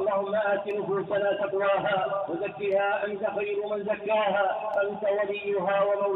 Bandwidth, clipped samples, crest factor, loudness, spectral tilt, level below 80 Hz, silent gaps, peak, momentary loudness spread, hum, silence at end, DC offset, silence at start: 4.1 kHz; under 0.1%; 14 dB; -27 LUFS; -3 dB/octave; -70 dBFS; none; -14 dBFS; 5 LU; none; 0 s; under 0.1%; 0 s